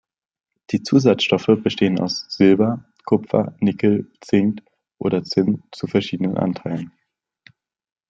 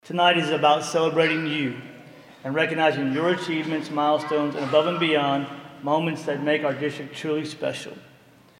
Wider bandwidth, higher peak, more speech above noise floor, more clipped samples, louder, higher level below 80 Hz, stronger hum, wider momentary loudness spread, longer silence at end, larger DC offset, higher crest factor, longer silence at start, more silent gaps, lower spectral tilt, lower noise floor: second, 7.6 kHz vs 15.5 kHz; about the same, -2 dBFS vs -4 dBFS; first, 36 dB vs 23 dB; neither; first, -20 LUFS vs -23 LUFS; first, -60 dBFS vs -72 dBFS; neither; about the same, 10 LU vs 11 LU; first, 1.2 s vs 0.6 s; neither; about the same, 18 dB vs 20 dB; first, 0.7 s vs 0.05 s; neither; first, -6.5 dB/octave vs -5 dB/octave; first, -55 dBFS vs -46 dBFS